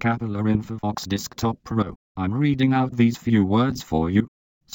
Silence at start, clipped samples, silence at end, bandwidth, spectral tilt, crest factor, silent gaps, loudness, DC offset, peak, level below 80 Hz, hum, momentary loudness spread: 0 s; under 0.1%; 0.5 s; 17 kHz; -6.5 dB/octave; 16 dB; 1.96-2.15 s; -23 LUFS; under 0.1%; -6 dBFS; -46 dBFS; none; 9 LU